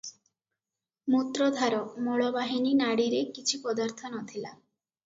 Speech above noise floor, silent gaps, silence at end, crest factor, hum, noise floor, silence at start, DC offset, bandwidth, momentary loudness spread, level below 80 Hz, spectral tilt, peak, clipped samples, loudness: over 62 dB; none; 0.5 s; 18 dB; none; under -90 dBFS; 0.05 s; under 0.1%; 7.8 kHz; 13 LU; -76 dBFS; -3.5 dB/octave; -12 dBFS; under 0.1%; -29 LUFS